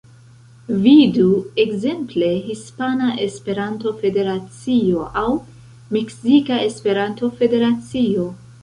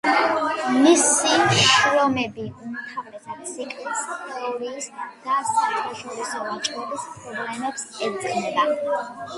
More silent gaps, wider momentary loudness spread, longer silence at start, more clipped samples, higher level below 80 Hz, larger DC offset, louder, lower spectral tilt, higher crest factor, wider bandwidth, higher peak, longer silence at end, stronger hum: neither; second, 10 LU vs 17 LU; first, 0.7 s vs 0.05 s; neither; first, -50 dBFS vs -62 dBFS; neither; first, -18 LUFS vs -22 LUFS; first, -6.5 dB/octave vs -2.5 dB/octave; about the same, 16 dB vs 20 dB; about the same, 11 kHz vs 11.5 kHz; about the same, -2 dBFS vs -2 dBFS; about the same, 0.1 s vs 0 s; neither